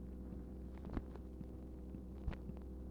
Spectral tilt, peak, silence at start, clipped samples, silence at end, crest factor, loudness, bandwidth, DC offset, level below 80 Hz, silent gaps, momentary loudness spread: -9 dB/octave; -28 dBFS; 0 s; under 0.1%; 0 s; 20 dB; -50 LUFS; 5.6 kHz; under 0.1%; -50 dBFS; none; 4 LU